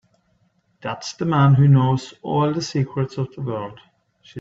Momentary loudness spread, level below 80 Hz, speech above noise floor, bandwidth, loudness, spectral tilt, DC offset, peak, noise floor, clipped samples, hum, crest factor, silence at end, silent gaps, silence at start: 16 LU; -56 dBFS; 45 dB; 7.6 kHz; -20 LUFS; -7.5 dB/octave; under 0.1%; -4 dBFS; -64 dBFS; under 0.1%; none; 16 dB; 0 s; none; 0.85 s